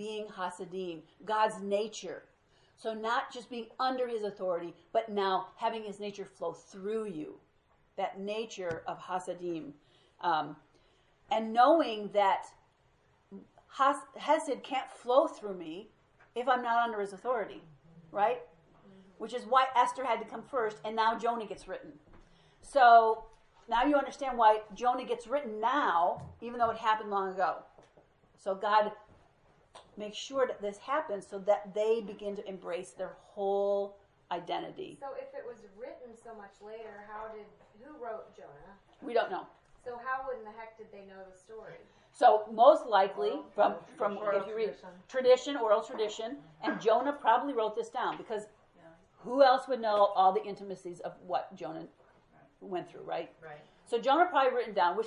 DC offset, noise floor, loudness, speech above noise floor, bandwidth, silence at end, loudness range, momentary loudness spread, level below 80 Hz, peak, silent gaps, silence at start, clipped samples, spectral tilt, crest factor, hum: under 0.1%; -69 dBFS; -31 LUFS; 37 dB; 11 kHz; 0 s; 11 LU; 20 LU; -70 dBFS; -10 dBFS; none; 0 s; under 0.1%; -4.5 dB/octave; 22 dB; none